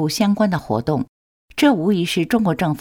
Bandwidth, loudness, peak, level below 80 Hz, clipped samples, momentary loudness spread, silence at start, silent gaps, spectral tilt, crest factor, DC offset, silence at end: 18 kHz; -19 LUFS; -2 dBFS; -50 dBFS; under 0.1%; 8 LU; 0 s; 1.08-1.48 s; -6 dB/octave; 16 dB; under 0.1%; 0 s